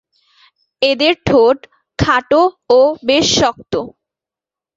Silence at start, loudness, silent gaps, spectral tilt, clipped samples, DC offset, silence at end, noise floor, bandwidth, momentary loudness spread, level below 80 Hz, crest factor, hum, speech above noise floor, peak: 0.8 s; -14 LUFS; none; -4 dB/octave; under 0.1%; under 0.1%; 0.9 s; -88 dBFS; 8 kHz; 11 LU; -40 dBFS; 14 dB; none; 75 dB; -2 dBFS